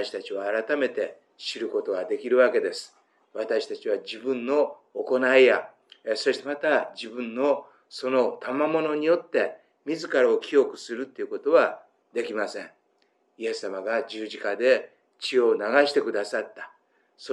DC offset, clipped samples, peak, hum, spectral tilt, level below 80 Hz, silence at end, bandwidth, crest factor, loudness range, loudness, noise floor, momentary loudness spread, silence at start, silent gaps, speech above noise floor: under 0.1%; under 0.1%; -6 dBFS; none; -3.5 dB/octave; under -90 dBFS; 0 s; 11 kHz; 20 dB; 4 LU; -25 LUFS; -68 dBFS; 14 LU; 0 s; none; 43 dB